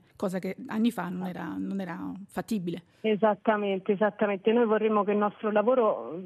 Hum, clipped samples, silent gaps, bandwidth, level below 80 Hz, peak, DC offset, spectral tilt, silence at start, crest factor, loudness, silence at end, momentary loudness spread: none; under 0.1%; none; 13.5 kHz; -72 dBFS; -12 dBFS; under 0.1%; -7 dB/octave; 0.2 s; 16 dB; -28 LUFS; 0 s; 10 LU